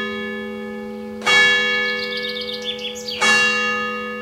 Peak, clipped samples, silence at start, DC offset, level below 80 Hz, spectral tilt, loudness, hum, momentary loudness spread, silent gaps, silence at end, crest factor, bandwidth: -4 dBFS; under 0.1%; 0 s; under 0.1%; -58 dBFS; -1.5 dB/octave; -18 LUFS; none; 16 LU; none; 0 s; 18 dB; 16 kHz